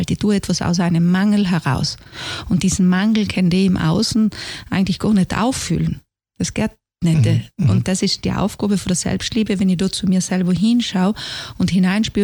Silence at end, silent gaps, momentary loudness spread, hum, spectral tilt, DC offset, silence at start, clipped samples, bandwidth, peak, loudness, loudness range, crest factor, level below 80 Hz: 0 s; none; 8 LU; none; -5.5 dB/octave; under 0.1%; 0 s; under 0.1%; 19 kHz; -4 dBFS; -18 LUFS; 2 LU; 14 dB; -40 dBFS